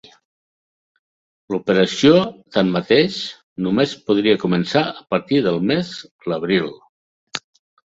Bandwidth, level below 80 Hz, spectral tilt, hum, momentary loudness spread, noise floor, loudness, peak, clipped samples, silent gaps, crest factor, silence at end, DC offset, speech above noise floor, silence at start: 8 kHz; -58 dBFS; -6 dB/octave; none; 16 LU; under -90 dBFS; -18 LUFS; -2 dBFS; under 0.1%; 3.43-3.56 s, 6.11-6.19 s, 6.89-7.27 s; 18 dB; 0.55 s; under 0.1%; over 72 dB; 1.5 s